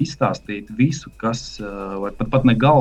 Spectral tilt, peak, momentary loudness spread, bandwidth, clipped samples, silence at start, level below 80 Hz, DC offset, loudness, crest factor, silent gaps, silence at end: -7 dB/octave; -2 dBFS; 14 LU; 8.6 kHz; under 0.1%; 0 s; -40 dBFS; under 0.1%; -21 LUFS; 18 dB; none; 0 s